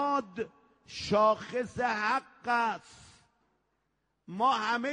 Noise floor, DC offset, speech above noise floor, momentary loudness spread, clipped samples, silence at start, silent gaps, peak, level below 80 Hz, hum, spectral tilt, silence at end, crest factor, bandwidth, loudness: -79 dBFS; under 0.1%; 48 dB; 15 LU; under 0.1%; 0 s; none; -14 dBFS; -66 dBFS; none; -4.5 dB/octave; 0 s; 16 dB; 10 kHz; -30 LUFS